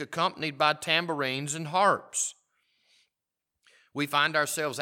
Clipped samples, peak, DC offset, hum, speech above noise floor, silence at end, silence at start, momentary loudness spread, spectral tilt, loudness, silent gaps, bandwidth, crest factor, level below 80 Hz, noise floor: under 0.1%; -8 dBFS; under 0.1%; none; 59 dB; 0 s; 0 s; 7 LU; -2.5 dB/octave; -27 LUFS; none; 18 kHz; 22 dB; -82 dBFS; -86 dBFS